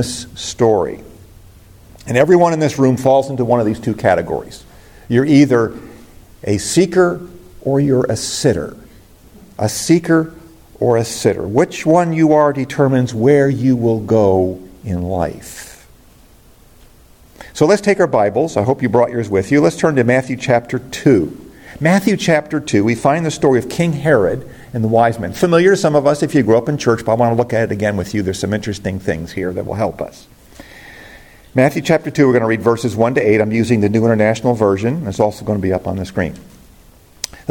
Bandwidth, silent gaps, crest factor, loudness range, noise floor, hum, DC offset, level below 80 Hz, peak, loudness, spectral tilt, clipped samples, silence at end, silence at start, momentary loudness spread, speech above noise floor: 17 kHz; none; 14 dB; 5 LU; -45 dBFS; none; under 0.1%; -46 dBFS; 0 dBFS; -15 LUFS; -6 dB/octave; under 0.1%; 0.25 s; 0 s; 12 LU; 31 dB